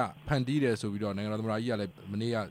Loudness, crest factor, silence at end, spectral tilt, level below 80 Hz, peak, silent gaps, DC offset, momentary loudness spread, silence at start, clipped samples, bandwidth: -32 LUFS; 16 dB; 0 s; -6.5 dB/octave; -58 dBFS; -14 dBFS; none; under 0.1%; 6 LU; 0 s; under 0.1%; 15.5 kHz